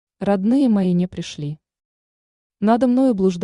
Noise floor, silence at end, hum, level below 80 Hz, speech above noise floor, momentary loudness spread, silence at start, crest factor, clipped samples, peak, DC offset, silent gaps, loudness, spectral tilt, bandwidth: under -90 dBFS; 0 s; none; -56 dBFS; over 72 dB; 13 LU; 0.2 s; 14 dB; under 0.1%; -6 dBFS; under 0.1%; 1.85-2.50 s; -18 LUFS; -8 dB/octave; 10.5 kHz